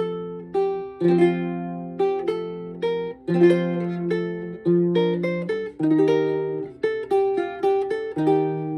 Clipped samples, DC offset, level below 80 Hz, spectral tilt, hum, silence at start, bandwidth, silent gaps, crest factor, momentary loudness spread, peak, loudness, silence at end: under 0.1%; under 0.1%; -62 dBFS; -8.5 dB/octave; none; 0 s; 9.6 kHz; none; 18 dB; 10 LU; -6 dBFS; -23 LUFS; 0 s